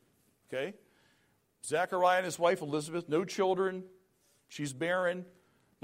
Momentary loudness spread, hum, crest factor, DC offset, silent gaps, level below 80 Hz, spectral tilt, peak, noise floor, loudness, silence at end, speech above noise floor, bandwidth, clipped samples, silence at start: 14 LU; none; 18 dB; under 0.1%; none; -80 dBFS; -4.5 dB/octave; -16 dBFS; -72 dBFS; -32 LUFS; 0.55 s; 40 dB; 16 kHz; under 0.1%; 0.5 s